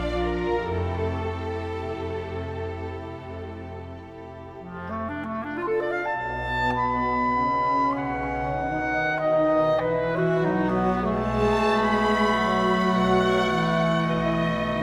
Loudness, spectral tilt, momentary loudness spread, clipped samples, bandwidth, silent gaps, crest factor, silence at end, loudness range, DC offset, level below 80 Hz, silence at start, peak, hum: -24 LUFS; -6.5 dB/octave; 15 LU; under 0.1%; 13 kHz; none; 16 dB; 0 s; 11 LU; under 0.1%; -42 dBFS; 0 s; -10 dBFS; none